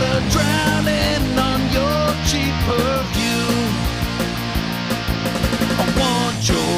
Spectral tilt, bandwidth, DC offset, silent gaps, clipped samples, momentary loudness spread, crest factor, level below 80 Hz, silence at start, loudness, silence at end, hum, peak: -4.5 dB/octave; 16 kHz; under 0.1%; none; under 0.1%; 5 LU; 12 dB; -28 dBFS; 0 s; -19 LUFS; 0 s; none; -6 dBFS